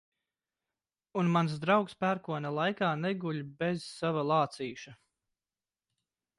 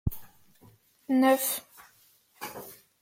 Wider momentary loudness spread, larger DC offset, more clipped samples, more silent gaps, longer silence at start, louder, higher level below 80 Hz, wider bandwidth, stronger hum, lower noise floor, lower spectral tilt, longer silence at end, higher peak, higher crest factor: second, 11 LU vs 24 LU; neither; neither; neither; first, 1.15 s vs 0.05 s; second, -32 LUFS vs -27 LUFS; second, -74 dBFS vs -50 dBFS; second, 11.5 kHz vs 16.5 kHz; neither; first, under -90 dBFS vs -63 dBFS; first, -6.5 dB/octave vs -4.5 dB/octave; first, 1.45 s vs 0.25 s; about the same, -14 dBFS vs -12 dBFS; about the same, 20 dB vs 20 dB